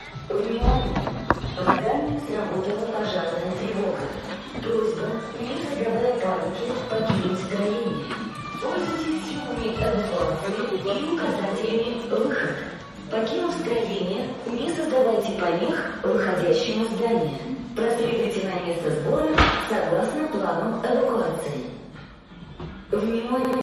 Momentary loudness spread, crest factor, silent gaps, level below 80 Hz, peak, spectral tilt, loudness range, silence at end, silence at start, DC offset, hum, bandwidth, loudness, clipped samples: 9 LU; 22 dB; none; -40 dBFS; -2 dBFS; -6 dB/octave; 4 LU; 0 s; 0 s; under 0.1%; none; 14 kHz; -25 LUFS; under 0.1%